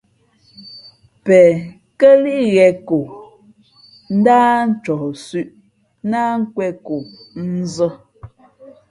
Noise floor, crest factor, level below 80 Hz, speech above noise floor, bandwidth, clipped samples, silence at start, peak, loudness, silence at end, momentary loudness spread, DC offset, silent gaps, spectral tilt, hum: -56 dBFS; 16 dB; -58 dBFS; 41 dB; 11 kHz; under 0.1%; 0.6 s; 0 dBFS; -15 LUFS; 0.65 s; 20 LU; under 0.1%; none; -7 dB/octave; none